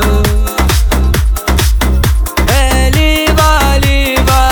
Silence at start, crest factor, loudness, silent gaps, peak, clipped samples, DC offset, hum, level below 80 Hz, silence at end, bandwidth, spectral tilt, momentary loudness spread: 0 s; 8 dB; -11 LUFS; none; 0 dBFS; under 0.1%; under 0.1%; none; -12 dBFS; 0 s; over 20 kHz; -4.5 dB/octave; 4 LU